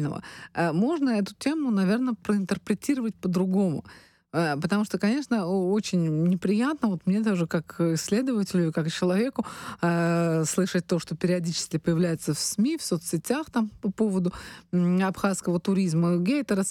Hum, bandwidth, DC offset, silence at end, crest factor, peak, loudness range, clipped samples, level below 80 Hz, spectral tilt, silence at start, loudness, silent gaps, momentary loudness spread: none; 14.5 kHz; under 0.1%; 0 s; 14 dB; -12 dBFS; 1 LU; under 0.1%; -62 dBFS; -6 dB/octave; 0 s; -26 LUFS; none; 5 LU